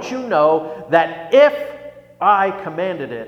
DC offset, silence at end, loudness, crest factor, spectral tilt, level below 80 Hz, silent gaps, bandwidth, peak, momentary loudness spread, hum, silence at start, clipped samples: under 0.1%; 0 s; -16 LUFS; 18 dB; -5.5 dB/octave; -62 dBFS; none; 7 kHz; 0 dBFS; 12 LU; none; 0 s; under 0.1%